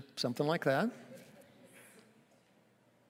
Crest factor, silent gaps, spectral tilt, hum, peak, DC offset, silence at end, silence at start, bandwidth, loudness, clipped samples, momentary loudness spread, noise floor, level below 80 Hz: 22 dB; none; -5.5 dB/octave; none; -16 dBFS; under 0.1%; 1.3 s; 0 s; 16 kHz; -34 LUFS; under 0.1%; 26 LU; -69 dBFS; -90 dBFS